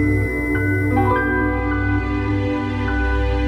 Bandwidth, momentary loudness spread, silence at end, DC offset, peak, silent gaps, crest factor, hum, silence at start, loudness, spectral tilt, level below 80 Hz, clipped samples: 14 kHz; 4 LU; 0 s; under 0.1%; -6 dBFS; none; 14 dB; none; 0 s; -20 LUFS; -8.5 dB/octave; -26 dBFS; under 0.1%